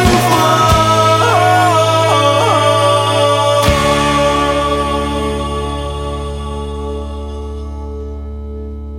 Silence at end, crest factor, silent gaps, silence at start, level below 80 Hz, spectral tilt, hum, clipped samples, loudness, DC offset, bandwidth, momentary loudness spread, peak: 0 s; 14 dB; none; 0 s; -26 dBFS; -4.5 dB/octave; none; under 0.1%; -12 LUFS; under 0.1%; 16.5 kHz; 16 LU; 0 dBFS